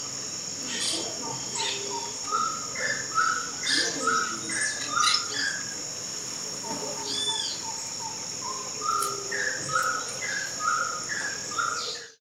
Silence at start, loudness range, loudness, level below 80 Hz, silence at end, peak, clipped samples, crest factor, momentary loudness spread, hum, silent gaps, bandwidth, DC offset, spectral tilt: 0 s; 4 LU; -27 LUFS; -66 dBFS; 0.05 s; -10 dBFS; under 0.1%; 20 dB; 8 LU; none; none; 16.5 kHz; under 0.1%; 0 dB/octave